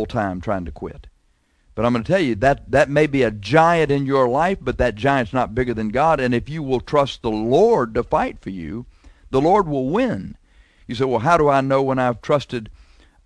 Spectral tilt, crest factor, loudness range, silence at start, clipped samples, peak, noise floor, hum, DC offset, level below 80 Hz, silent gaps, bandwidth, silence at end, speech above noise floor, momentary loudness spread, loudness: -7 dB/octave; 18 dB; 3 LU; 0 s; under 0.1%; -2 dBFS; -61 dBFS; none; under 0.1%; -40 dBFS; none; 10.5 kHz; 0.55 s; 42 dB; 14 LU; -19 LUFS